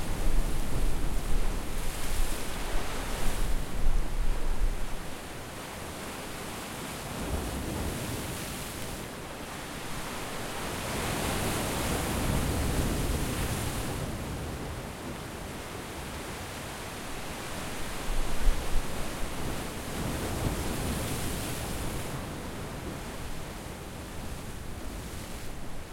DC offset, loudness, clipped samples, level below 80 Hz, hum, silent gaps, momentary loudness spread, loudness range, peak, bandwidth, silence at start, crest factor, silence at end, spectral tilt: under 0.1%; -35 LUFS; under 0.1%; -34 dBFS; none; none; 9 LU; 7 LU; -10 dBFS; 16.5 kHz; 0 s; 20 dB; 0 s; -4 dB/octave